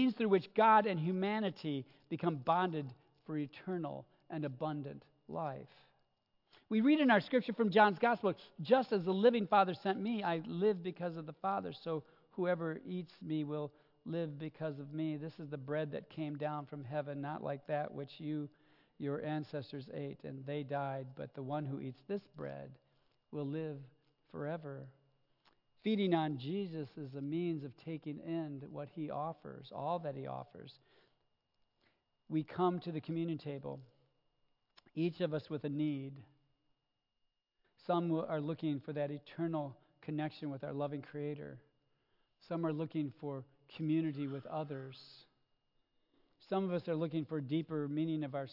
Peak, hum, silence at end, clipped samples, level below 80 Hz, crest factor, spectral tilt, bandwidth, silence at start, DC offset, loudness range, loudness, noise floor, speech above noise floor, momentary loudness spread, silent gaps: -14 dBFS; none; 0 s; under 0.1%; -84 dBFS; 24 dB; -5.5 dB/octave; 5.8 kHz; 0 s; under 0.1%; 11 LU; -38 LUFS; -86 dBFS; 49 dB; 16 LU; none